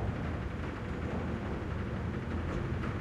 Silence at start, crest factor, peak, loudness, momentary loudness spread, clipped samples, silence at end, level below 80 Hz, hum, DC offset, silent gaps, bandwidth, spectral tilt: 0 s; 14 dB; -22 dBFS; -37 LUFS; 2 LU; under 0.1%; 0 s; -44 dBFS; none; under 0.1%; none; 9.8 kHz; -8 dB/octave